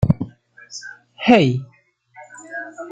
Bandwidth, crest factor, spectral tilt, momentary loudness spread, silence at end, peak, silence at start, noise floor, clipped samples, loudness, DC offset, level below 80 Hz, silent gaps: 8.6 kHz; 20 dB; -6.5 dB/octave; 24 LU; 0 s; -2 dBFS; 0 s; -47 dBFS; under 0.1%; -18 LUFS; under 0.1%; -44 dBFS; none